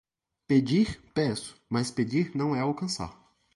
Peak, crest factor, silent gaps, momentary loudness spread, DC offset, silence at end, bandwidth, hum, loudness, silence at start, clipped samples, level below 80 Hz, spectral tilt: -12 dBFS; 18 dB; none; 8 LU; under 0.1%; 0.45 s; 11.5 kHz; none; -28 LUFS; 0.5 s; under 0.1%; -56 dBFS; -6 dB/octave